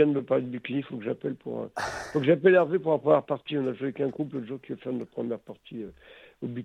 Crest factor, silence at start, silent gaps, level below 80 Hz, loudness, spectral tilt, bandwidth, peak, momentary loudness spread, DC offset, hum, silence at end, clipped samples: 20 dB; 0 s; none; -66 dBFS; -28 LUFS; -7 dB/octave; 11 kHz; -8 dBFS; 16 LU; under 0.1%; none; 0 s; under 0.1%